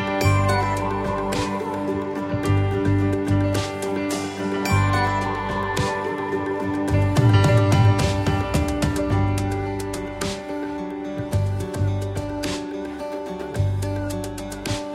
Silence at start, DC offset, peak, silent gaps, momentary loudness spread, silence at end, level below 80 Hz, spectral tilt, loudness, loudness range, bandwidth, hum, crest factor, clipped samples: 0 s; under 0.1%; -4 dBFS; none; 11 LU; 0 s; -38 dBFS; -6 dB/octave; -23 LUFS; 7 LU; 14.5 kHz; none; 16 dB; under 0.1%